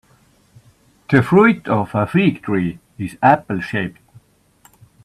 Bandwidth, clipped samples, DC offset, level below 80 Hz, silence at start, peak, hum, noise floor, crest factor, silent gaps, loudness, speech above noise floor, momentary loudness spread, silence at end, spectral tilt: 13 kHz; under 0.1%; under 0.1%; -54 dBFS; 1.1 s; 0 dBFS; none; -55 dBFS; 18 dB; none; -17 LUFS; 39 dB; 13 LU; 1.15 s; -8 dB/octave